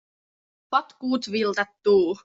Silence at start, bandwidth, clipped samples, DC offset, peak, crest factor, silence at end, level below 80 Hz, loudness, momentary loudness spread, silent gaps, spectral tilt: 0.7 s; 7.8 kHz; under 0.1%; under 0.1%; -8 dBFS; 18 dB; 0.1 s; -68 dBFS; -24 LUFS; 6 LU; none; -5 dB/octave